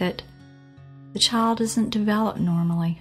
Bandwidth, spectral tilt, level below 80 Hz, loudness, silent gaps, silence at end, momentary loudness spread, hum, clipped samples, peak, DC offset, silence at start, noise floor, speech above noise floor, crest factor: 14.5 kHz; -5 dB/octave; -54 dBFS; -22 LUFS; none; 0 s; 9 LU; none; under 0.1%; -6 dBFS; under 0.1%; 0 s; -47 dBFS; 25 dB; 18 dB